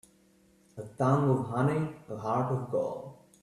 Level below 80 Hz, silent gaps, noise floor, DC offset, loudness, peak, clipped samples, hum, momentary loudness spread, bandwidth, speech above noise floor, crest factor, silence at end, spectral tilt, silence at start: -66 dBFS; none; -64 dBFS; under 0.1%; -30 LUFS; -14 dBFS; under 0.1%; none; 19 LU; 11 kHz; 34 dB; 18 dB; 0.25 s; -8.5 dB/octave; 0.75 s